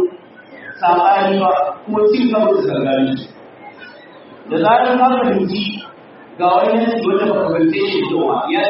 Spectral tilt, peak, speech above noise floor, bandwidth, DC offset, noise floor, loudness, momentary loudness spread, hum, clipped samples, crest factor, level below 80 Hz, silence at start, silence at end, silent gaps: -4 dB/octave; -2 dBFS; 24 dB; 5.8 kHz; under 0.1%; -39 dBFS; -15 LUFS; 13 LU; none; under 0.1%; 14 dB; -60 dBFS; 0 s; 0 s; none